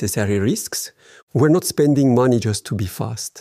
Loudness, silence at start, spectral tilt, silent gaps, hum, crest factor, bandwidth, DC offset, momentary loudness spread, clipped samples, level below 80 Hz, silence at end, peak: -19 LUFS; 0 s; -5.5 dB/octave; 1.22-1.27 s; none; 14 dB; 15.5 kHz; under 0.1%; 11 LU; under 0.1%; -52 dBFS; 0 s; -4 dBFS